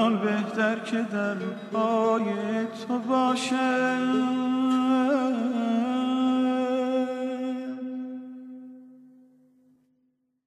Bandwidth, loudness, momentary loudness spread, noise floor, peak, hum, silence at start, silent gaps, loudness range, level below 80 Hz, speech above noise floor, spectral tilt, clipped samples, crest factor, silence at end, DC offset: 11 kHz; -26 LUFS; 11 LU; -72 dBFS; -10 dBFS; none; 0 s; none; 8 LU; -84 dBFS; 47 dB; -5.5 dB/octave; under 0.1%; 16 dB; 1.5 s; under 0.1%